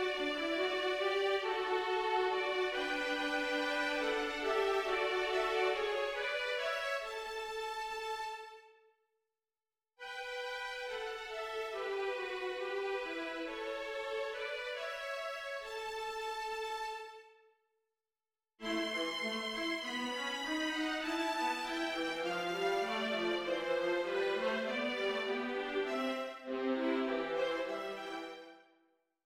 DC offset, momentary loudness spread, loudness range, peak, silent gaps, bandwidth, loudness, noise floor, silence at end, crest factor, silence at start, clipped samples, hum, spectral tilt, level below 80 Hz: under 0.1%; 8 LU; 8 LU; -20 dBFS; none; 16.5 kHz; -36 LUFS; under -90 dBFS; 0.65 s; 16 dB; 0 s; under 0.1%; none; -2.5 dB/octave; -68 dBFS